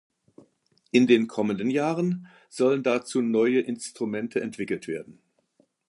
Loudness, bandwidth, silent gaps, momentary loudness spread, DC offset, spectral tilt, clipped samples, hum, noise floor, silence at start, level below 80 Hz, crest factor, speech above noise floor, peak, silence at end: -25 LUFS; 11.5 kHz; none; 11 LU; under 0.1%; -6 dB/octave; under 0.1%; none; -67 dBFS; 0.95 s; -72 dBFS; 20 dB; 42 dB; -6 dBFS; 0.75 s